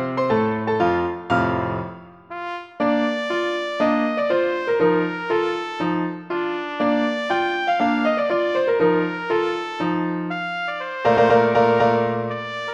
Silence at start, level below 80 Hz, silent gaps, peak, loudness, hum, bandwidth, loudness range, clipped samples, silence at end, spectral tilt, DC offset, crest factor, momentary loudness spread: 0 s; -56 dBFS; none; -4 dBFS; -21 LUFS; none; 8.6 kHz; 3 LU; under 0.1%; 0 s; -6.5 dB/octave; under 0.1%; 16 dB; 9 LU